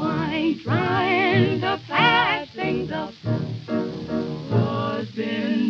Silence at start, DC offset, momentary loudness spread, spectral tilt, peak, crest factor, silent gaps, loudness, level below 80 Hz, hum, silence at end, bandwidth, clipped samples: 0 s; under 0.1%; 10 LU; -7 dB/octave; -6 dBFS; 18 dB; none; -23 LUFS; -54 dBFS; none; 0 s; 7 kHz; under 0.1%